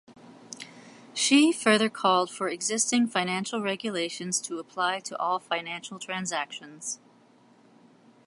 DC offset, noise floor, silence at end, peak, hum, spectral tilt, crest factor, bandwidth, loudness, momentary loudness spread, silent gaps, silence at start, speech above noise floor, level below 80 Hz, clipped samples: under 0.1%; -58 dBFS; 1.3 s; -6 dBFS; none; -2.5 dB/octave; 22 dB; 11.5 kHz; -27 LUFS; 15 LU; none; 0.1 s; 31 dB; -80 dBFS; under 0.1%